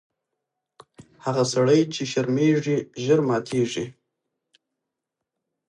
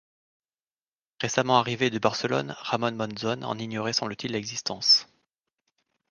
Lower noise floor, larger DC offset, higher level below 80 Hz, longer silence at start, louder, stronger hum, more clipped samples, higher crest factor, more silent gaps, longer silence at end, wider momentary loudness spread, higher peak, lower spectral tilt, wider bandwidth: second, -84 dBFS vs under -90 dBFS; neither; about the same, -68 dBFS vs -66 dBFS; about the same, 1.25 s vs 1.2 s; first, -23 LUFS vs -26 LUFS; neither; neither; second, 18 dB vs 24 dB; neither; first, 1.8 s vs 1.05 s; second, 9 LU vs 12 LU; second, -8 dBFS vs -4 dBFS; first, -6 dB/octave vs -3.5 dB/octave; about the same, 11 kHz vs 11.5 kHz